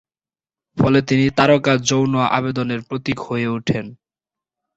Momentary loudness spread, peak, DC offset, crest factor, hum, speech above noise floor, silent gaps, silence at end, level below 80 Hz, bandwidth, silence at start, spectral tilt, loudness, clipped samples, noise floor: 10 LU; -2 dBFS; under 0.1%; 18 dB; none; over 72 dB; none; 0.85 s; -50 dBFS; 8 kHz; 0.75 s; -5.5 dB/octave; -18 LUFS; under 0.1%; under -90 dBFS